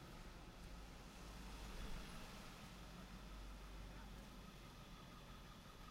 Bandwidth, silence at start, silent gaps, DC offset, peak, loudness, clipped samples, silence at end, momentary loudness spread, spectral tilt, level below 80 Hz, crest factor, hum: 16 kHz; 0 s; none; under 0.1%; -40 dBFS; -57 LUFS; under 0.1%; 0 s; 5 LU; -4.5 dB/octave; -58 dBFS; 16 dB; none